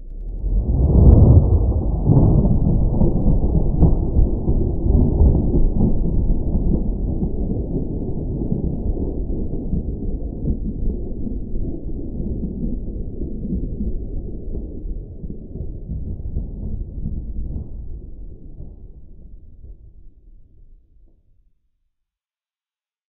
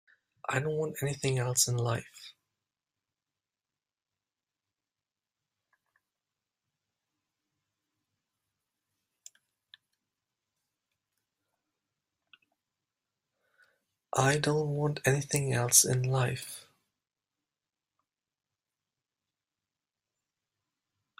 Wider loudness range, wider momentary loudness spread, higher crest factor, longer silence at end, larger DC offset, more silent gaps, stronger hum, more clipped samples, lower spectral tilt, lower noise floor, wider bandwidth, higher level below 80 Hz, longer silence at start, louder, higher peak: first, 16 LU vs 11 LU; about the same, 17 LU vs 18 LU; second, 18 dB vs 30 dB; second, 2.45 s vs 4.6 s; neither; neither; neither; neither; first, -16.5 dB/octave vs -3.5 dB/octave; about the same, under -90 dBFS vs under -90 dBFS; second, 1.3 kHz vs 16 kHz; first, -22 dBFS vs -68 dBFS; second, 0 s vs 0.5 s; first, -21 LUFS vs -29 LUFS; first, 0 dBFS vs -6 dBFS